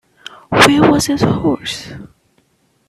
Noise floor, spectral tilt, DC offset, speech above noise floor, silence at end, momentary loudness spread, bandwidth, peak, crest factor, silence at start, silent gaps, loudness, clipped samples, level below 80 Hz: -58 dBFS; -4.5 dB/octave; under 0.1%; 44 dB; 0.8 s; 16 LU; 15.5 kHz; 0 dBFS; 16 dB; 0.5 s; none; -13 LUFS; under 0.1%; -42 dBFS